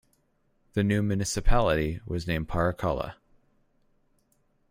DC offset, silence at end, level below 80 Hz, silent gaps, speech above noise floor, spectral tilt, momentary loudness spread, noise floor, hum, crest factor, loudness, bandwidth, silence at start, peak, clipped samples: under 0.1%; 1.6 s; -34 dBFS; none; 44 dB; -5.5 dB/octave; 8 LU; -69 dBFS; none; 20 dB; -28 LUFS; 15.5 kHz; 0.75 s; -8 dBFS; under 0.1%